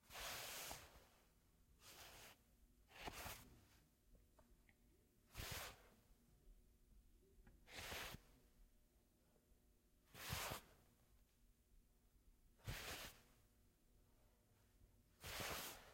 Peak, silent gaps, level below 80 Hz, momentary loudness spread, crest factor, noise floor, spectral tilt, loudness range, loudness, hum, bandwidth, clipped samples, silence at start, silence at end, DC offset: -34 dBFS; none; -70 dBFS; 16 LU; 26 dB; -78 dBFS; -2 dB/octave; 5 LU; -53 LUFS; none; 16.5 kHz; under 0.1%; 0 s; 0 s; under 0.1%